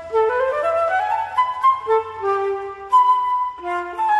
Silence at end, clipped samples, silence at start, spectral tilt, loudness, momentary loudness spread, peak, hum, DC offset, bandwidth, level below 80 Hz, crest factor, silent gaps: 0 s; under 0.1%; 0 s; -4 dB/octave; -19 LUFS; 8 LU; -6 dBFS; none; under 0.1%; 12 kHz; -58 dBFS; 12 dB; none